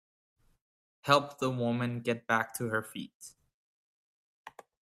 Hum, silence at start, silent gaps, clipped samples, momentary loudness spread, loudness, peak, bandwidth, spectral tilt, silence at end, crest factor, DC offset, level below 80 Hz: none; 1.05 s; 3.14-3.20 s, 3.54-4.45 s; under 0.1%; 24 LU; -31 LUFS; -10 dBFS; 15.5 kHz; -5 dB/octave; 0.3 s; 26 dB; under 0.1%; -72 dBFS